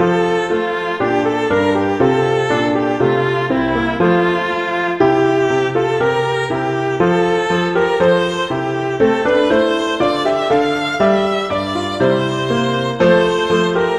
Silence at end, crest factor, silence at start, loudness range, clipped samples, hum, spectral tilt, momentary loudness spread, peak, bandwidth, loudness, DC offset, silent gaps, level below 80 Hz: 0 s; 14 dB; 0 s; 1 LU; under 0.1%; none; -6 dB/octave; 5 LU; -2 dBFS; 11.5 kHz; -16 LUFS; under 0.1%; none; -46 dBFS